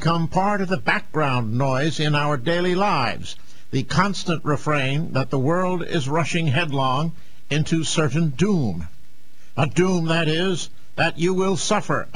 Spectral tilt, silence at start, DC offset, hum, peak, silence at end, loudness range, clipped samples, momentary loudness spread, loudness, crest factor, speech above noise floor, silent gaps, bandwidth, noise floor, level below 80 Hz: -5.5 dB/octave; 0 s; 5%; none; -4 dBFS; 0.1 s; 1 LU; under 0.1%; 7 LU; -22 LUFS; 18 dB; 34 dB; none; 10.5 kHz; -55 dBFS; -50 dBFS